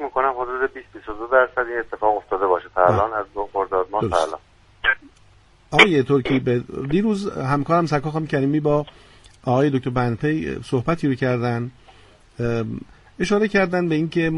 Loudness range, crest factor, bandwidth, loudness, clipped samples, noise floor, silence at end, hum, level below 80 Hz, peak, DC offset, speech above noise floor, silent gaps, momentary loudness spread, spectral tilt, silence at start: 4 LU; 22 dB; 11.5 kHz; -21 LUFS; under 0.1%; -53 dBFS; 0 s; none; -46 dBFS; 0 dBFS; under 0.1%; 32 dB; none; 9 LU; -6.5 dB/octave; 0 s